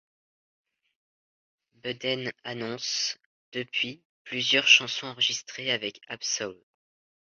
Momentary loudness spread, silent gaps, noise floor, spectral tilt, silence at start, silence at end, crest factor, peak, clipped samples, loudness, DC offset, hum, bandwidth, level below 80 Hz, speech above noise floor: 18 LU; 3.26-3.52 s, 4.05-4.25 s; under -90 dBFS; -1 dB/octave; 1.85 s; 0.7 s; 26 dB; -4 dBFS; under 0.1%; -26 LUFS; under 0.1%; none; 7.8 kHz; -76 dBFS; over 62 dB